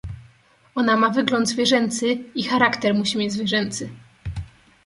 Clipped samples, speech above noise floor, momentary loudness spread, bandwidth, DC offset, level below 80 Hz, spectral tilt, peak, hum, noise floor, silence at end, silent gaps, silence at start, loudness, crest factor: under 0.1%; 35 dB; 17 LU; 11.5 kHz; under 0.1%; -46 dBFS; -4 dB/octave; 0 dBFS; none; -55 dBFS; 0.4 s; none; 0.05 s; -21 LUFS; 22 dB